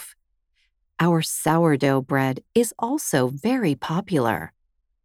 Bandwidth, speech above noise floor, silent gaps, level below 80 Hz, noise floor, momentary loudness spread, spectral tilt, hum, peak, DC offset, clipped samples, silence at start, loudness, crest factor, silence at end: 18 kHz; 48 dB; none; -60 dBFS; -69 dBFS; 7 LU; -5.5 dB/octave; none; -6 dBFS; under 0.1%; under 0.1%; 0 s; -22 LUFS; 18 dB; 0.55 s